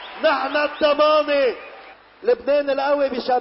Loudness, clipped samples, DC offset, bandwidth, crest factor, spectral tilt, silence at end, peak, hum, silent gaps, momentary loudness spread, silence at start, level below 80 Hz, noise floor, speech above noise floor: -19 LUFS; under 0.1%; under 0.1%; 5.8 kHz; 14 dB; -7 dB/octave; 0 s; -6 dBFS; none; none; 7 LU; 0 s; -58 dBFS; -43 dBFS; 24 dB